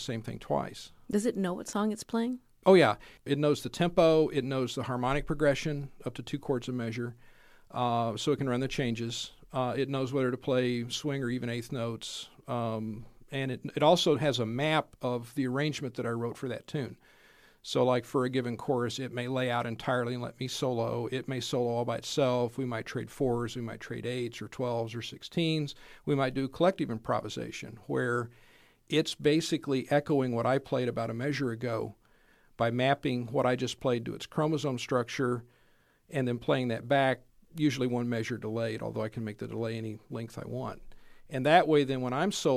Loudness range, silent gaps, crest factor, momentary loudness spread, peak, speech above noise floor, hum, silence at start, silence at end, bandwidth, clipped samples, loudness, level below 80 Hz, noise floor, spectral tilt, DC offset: 5 LU; none; 24 dB; 11 LU; -8 dBFS; 35 dB; none; 0 s; 0 s; 15.5 kHz; under 0.1%; -31 LUFS; -58 dBFS; -65 dBFS; -5.5 dB/octave; under 0.1%